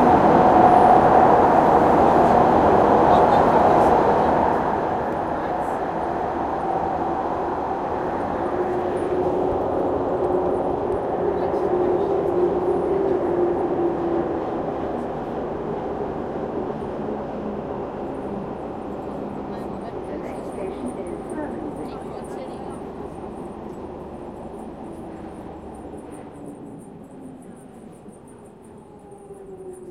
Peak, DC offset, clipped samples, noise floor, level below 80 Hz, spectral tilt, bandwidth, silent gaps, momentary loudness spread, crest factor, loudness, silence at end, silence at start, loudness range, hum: -2 dBFS; under 0.1%; under 0.1%; -43 dBFS; -44 dBFS; -7.5 dB/octave; 12 kHz; none; 21 LU; 20 dB; -21 LUFS; 0 s; 0 s; 21 LU; none